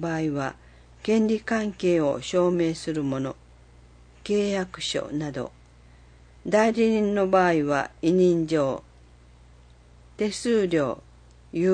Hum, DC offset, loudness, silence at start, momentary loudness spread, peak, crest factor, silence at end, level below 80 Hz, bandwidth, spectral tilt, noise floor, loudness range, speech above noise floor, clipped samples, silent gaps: 60 Hz at -50 dBFS; under 0.1%; -25 LUFS; 0 s; 14 LU; -6 dBFS; 18 dB; 0 s; -54 dBFS; 9.8 kHz; -6 dB/octave; -52 dBFS; 6 LU; 28 dB; under 0.1%; none